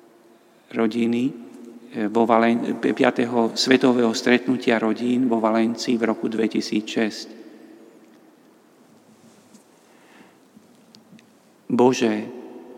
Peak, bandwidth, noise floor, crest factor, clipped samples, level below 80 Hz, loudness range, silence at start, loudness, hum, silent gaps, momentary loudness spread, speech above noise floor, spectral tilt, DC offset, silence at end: 0 dBFS; 13.5 kHz; -54 dBFS; 22 dB; under 0.1%; -76 dBFS; 9 LU; 0.7 s; -21 LUFS; none; none; 15 LU; 34 dB; -5 dB/octave; under 0.1%; 0 s